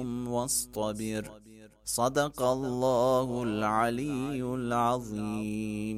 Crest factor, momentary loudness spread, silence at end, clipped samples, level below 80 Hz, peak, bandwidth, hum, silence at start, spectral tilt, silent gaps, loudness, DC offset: 16 dB; 8 LU; 0 s; under 0.1%; -56 dBFS; -14 dBFS; 16 kHz; none; 0 s; -5 dB/octave; none; -30 LUFS; under 0.1%